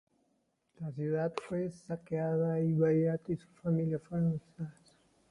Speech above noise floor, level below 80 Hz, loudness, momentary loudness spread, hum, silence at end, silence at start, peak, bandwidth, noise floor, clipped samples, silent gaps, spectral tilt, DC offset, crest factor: 44 dB; -68 dBFS; -34 LUFS; 15 LU; none; 0.6 s; 0.8 s; -16 dBFS; 10.5 kHz; -77 dBFS; under 0.1%; none; -9.5 dB/octave; under 0.1%; 18 dB